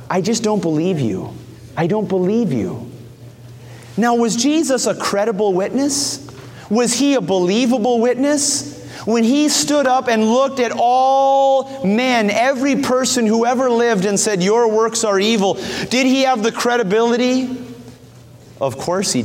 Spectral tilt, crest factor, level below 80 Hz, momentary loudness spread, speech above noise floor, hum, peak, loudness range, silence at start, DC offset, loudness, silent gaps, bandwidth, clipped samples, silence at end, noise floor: -4 dB/octave; 12 dB; -56 dBFS; 9 LU; 26 dB; none; -4 dBFS; 4 LU; 0 s; under 0.1%; -16 LUFS; none; 16.5 kHz; under 0.1%; 0 s; -41 dBFS